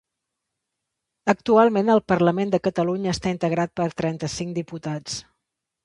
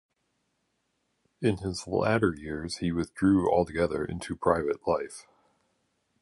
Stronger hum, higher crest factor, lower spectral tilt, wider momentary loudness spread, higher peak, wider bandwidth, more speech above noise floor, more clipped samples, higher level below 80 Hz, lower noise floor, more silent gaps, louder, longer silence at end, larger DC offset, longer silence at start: neither; about the same, 20 dB vs 22 dB; about the same, -6 dB/octave vs -6.5 dB/octave; first, 13 LU vs 10 LU; first, -2 dBFS vs -8 dBFS; about the same, 11.5 kHz vs 11.5 kHz; first, 60 dB vs 49 dB; neither; about the same, -54 dBFS vs -50 dBFS; first, -82 dBFS vs -77 dBFS; neither; first, -22 LUFS vs -28 LUFS; second, 0.65 s vs 1 s; neither; second, 1.25 s vs 1.4 s